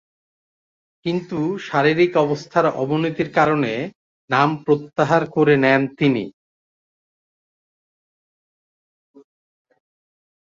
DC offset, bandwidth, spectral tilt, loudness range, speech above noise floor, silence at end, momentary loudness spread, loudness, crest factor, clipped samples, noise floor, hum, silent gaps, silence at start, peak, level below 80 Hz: under 0.1%; 7.6 kHz; -7 dB/octave; 4 LU; over 72 dB; 4.15 s; 9 LU; -19 LUFS; 20 dB; under 0.1%; under -90 dBFS; none; 3.95-4.28 s; 1.05 s; -2 dBFS; -62 dBFS